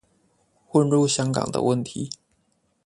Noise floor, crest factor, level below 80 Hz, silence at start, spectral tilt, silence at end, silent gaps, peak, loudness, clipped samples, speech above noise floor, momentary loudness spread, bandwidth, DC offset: -69 dBFS; 20 dB; -60 dBFS; 0.75 s; -5.5 dB/octave; 0.8 s; none; -6 dBFS; -23 LUFS; under 0.1%; 47 dB; 14 LU; 11.5 kHz; under 0.1%